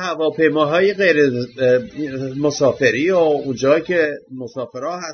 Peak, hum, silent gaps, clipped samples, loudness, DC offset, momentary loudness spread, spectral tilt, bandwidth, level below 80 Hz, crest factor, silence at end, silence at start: -2 dBFS; none; none; under 0.1%; -17 LUFS; under 0.1%; 12 LU; -5.5 dB/octave; 6.6 kHz; -58 dBFS; 16 dB; 0 s; 0 s